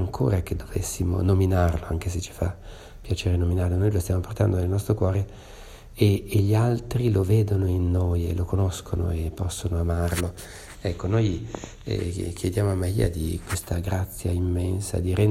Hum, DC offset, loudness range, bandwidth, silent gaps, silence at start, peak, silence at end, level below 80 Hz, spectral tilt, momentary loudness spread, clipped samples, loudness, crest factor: none; under 0.1%; 4 LU; 15.5 kHz; none; 0 s; -6 dBFS; 0 s; -36 dBFS; -7 dB/octave; 10 LU; under 0.1%; -25 LUFS; 18 dB